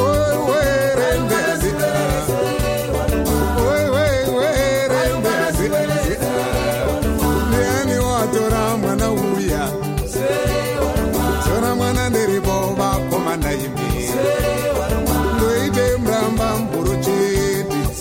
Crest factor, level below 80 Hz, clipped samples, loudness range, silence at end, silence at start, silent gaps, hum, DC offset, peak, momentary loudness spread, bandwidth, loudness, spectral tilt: 12 dB; -28 dBFS; under 0.1%; 1 LU; 0 s; 0 s; none; none; under 0.1%; -4 dBFS; 3 LU; 16.5 kHz; -18 LUFS; -5 dB/octave